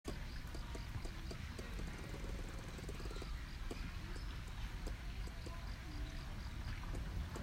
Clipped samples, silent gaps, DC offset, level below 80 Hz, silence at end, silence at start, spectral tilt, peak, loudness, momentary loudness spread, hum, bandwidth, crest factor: under 0.1%; none; under 0.1%; -46 dBFS; 0 s; 0.05 s; -5 dB/octave; -32 dBFS; -48 LUFS; 2 LU; none; 16 kHz; 14 dB